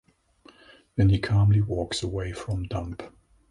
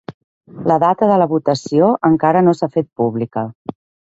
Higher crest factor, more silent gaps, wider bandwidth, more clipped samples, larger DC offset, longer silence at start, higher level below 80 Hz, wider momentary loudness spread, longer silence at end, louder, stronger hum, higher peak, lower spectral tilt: about the same, 16 dB vs 16 dB; second, none vs 0.14-0.41 s, 3.55-3.65 s; first, 11 kHz vs 8 kHz; neither; neither; first, 0.95 s vs 0.1 s; first, -40 dBFS vs -58 dBFS; first, 15 LU vs 11 LU; about the same, 0.4 s vs 0.4 s; second, -26 LUFS vs -15 LUFS; neither; second, -10 dBFS vs 0 dBFS; about the same, -6.5 dB/octave vs -7.5 dB/octave